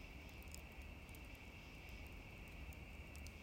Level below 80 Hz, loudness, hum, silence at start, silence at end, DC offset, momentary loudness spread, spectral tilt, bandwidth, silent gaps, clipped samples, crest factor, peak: -58 dBFS; -56 LUFS; none; 0 s; 0 s; under 0.1%; 1 LU; -4.5 dB/octave; 16 kHz; none; under 0.1%; 22 dB; -34 dBFS